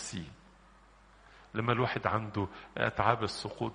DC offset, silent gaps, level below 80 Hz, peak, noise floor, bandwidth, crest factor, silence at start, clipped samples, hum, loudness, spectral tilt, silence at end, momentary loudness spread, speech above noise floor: under 0.1%; none; -60 dBFS; -10 dBFS; -60 dBFS; 10 kHz; 26 dB; 0 s; under 0.1%; none; -33 LUFS; -5.5 dB/octave; 0 s; 11 LU; 27 dB